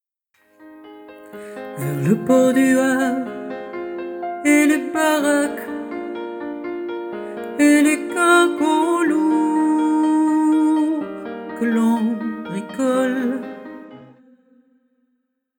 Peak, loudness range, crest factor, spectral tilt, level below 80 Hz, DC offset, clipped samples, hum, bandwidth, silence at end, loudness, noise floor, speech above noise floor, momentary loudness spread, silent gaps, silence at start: -4 dBFS; 6 LU; 16 dB; -5 dB/octave; -66 dBFS; under 0.1%; under 0.1%; none; 17.5 kHz; 1.55 s; -19 LUFS; -71 dBFS; 53 dB; 15 LU; none; 0.6 s